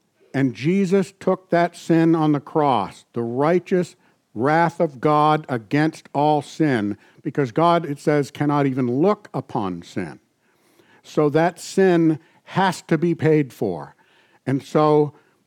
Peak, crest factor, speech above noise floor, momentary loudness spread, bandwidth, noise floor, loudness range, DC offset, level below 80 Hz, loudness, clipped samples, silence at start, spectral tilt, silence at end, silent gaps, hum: -6 dBFS; 14 dB; 42 dB; 11 LU; 14.5 kHz; -62 dBFS; 2 LU; under 0.1%; -70 dBFS; -21 LUFS; under 0.1%; 0.35 s; -7 dB/octave; 0.35 s; none; none